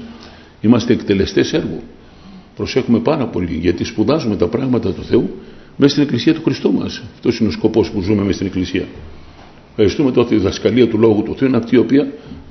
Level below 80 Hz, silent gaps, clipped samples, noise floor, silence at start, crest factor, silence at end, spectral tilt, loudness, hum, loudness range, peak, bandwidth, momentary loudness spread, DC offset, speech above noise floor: -40 dBFS; none; under 0.1%; -40 dBFS; 0 s; 16 dB; 0 s; -6.5 dB/octave; -16 LUFS; none; 3 LU; 0 dBFS; 6.4 kHz; 10 LU; under 0.1%; 25 dB